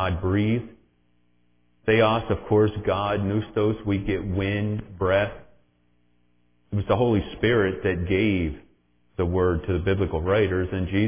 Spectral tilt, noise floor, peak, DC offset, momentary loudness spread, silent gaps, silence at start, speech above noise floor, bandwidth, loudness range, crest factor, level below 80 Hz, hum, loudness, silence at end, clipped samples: -11 dB/octave; -67 dBFS; -8 dBFS; under 0.1%; 8 LU; none; 0 s; 44 dB; 3.6 kHz; 3 LU; 16 dB; -38 dBFS; 60 Hz at -55 dBFS; -24 LUFS; 0 s; under 0.1%